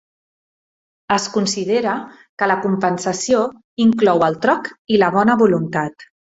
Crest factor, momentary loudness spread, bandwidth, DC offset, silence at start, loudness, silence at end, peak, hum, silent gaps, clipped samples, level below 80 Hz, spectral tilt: 16 dB; 9 LU; 8 kHz; under 0.1%; 1.1 s; -18 LUFS; 0.35 s; -2 dBFS; none; 2.29-2.37 s, 3.64-3.77 s, 4.79-4.85 s; under 0.1%; -60 dBFS; -5 dB/octave